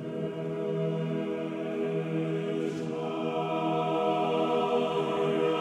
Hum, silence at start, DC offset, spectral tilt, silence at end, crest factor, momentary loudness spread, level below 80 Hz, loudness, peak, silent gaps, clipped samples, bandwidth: none; 0 s; under 0.1%; -7 dB/octave; 0 s; 14 dB; 6 LU; -76 dBFS; -30 LUFS; -16 dBFS; none; under 0.1%; 11 kHz